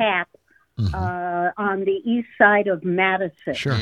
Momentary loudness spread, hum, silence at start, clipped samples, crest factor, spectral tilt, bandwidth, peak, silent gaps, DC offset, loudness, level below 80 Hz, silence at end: 11 LU; none; 0 s; under 0.1%; 20 dB; -6.5 dB/octave; 10.5 kHz; -2 dBFS; none; under 0.1%; -21 LUFS; -48 dBFS; 0 s